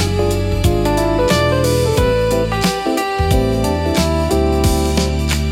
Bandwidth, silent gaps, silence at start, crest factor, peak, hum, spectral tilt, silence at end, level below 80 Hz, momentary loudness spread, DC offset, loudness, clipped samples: 17 kHz; none; 0 s; 14 dB; -2 dBFS; none; -5.5 dB/octave; 0 s; -24 dBFS; 3 LU; under 0.1%; -16 LUFS; under 0.1%